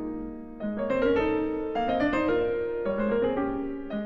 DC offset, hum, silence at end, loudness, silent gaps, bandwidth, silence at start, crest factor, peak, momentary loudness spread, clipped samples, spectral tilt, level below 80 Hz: under 0.1%; none; 0 s; -28 LUFS; none; 7.4 kHz; 0 s; 12 dB; -14 dBFS; 10 LU; under 0.1%; -8 dB/octave; -46 dBFS